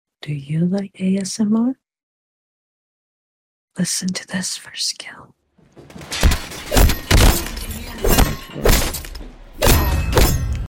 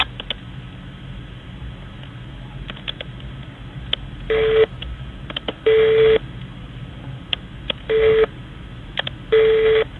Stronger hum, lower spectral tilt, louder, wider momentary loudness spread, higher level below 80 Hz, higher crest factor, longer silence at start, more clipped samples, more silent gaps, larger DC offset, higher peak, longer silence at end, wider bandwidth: neither; second, -4.5 dB/octave vs -6.5 dB/octave; about the same, -19 LUFS vs -19 LUFS; second, 14 LU vs 21 LU; first, -22 dBFS vs -38 dBFS; second, 16 dB vs 22 dB; first, 0.25 s vs 0 s; neither; first, 2.03-3.68 s vs none; neither; second, -4 dBFS vs 0 dBFS; about the same, 0.05 s vs 0 s; first, 17 kHz vs 4.2 kHz